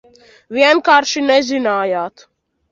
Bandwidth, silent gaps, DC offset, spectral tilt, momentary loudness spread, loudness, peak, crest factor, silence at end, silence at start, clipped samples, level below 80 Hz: 7.6 kHz; none; under 0.1%; -2.5 dB/octave; 12 LU; -14 LUFS; 0 dBFS; 16 dB; 0.65 s; 0.5 s; under 0.1%; -62 dBFS